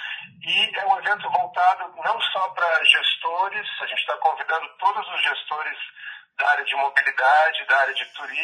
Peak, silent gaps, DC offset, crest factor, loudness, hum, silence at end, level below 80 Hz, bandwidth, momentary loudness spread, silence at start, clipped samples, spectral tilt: 0 dBFS; none; under 0.1%; 22 dB; -21 LUFS; none; 0 s; -84 dBFS; 10 kHz; 11 LU; 0 s; under 0.1%; -0.5 dB/octave